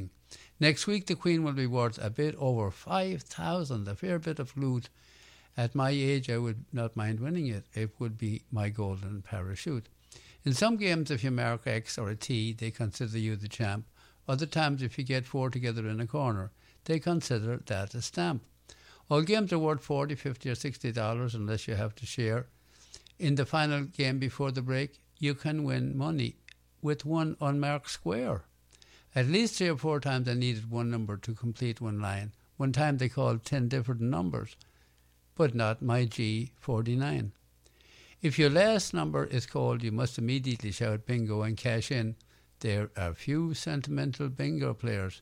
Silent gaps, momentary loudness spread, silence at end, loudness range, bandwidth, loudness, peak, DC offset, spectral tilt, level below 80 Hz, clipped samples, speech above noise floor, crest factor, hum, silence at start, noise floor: none; 8 LU; 0 s; 4 LU; 13.5 kHz; -32 LUFS; -12 dBFS; under 0.1%; -6 dB/octave; -60 dBFS; under 0.1%; 34 dB; 20 dB; none; 0 s; -65 dBFS